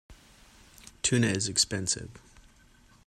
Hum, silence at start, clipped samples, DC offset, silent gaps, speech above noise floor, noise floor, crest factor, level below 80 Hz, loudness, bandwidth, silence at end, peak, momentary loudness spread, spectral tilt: none; 0.1 s; under 0.1%; under 0.1%; none; 30 dB; -59 dBFS; 22 dB; -56 dBFS; -27 LUFS; 13.5 kHz; 0.9 s; -10 dBFS; 7 LU; -3 dB/octave